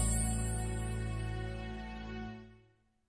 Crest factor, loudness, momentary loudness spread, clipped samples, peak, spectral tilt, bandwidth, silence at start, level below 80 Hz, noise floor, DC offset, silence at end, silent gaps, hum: 16 dB; -38 LUFS; 13 LU; under 0.1%; -20 dBFS; -4.5 dB/octave; 11 kHz; 0 s; -42 dBFS; -69 dBFS; under 0.1%; 0.5 s; none; none